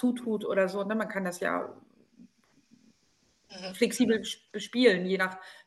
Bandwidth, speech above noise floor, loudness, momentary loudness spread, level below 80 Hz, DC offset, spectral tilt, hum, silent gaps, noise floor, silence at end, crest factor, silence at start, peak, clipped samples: 12.5 kHz; 40 dB; -29 LUFS; 15 LU; -74 dBFS; under 0.1%; -4.5 dB/octave; none; none; -69 dBFS; 0.15 s; 22 dB; 0 s; -10 dBFS; under 0.1%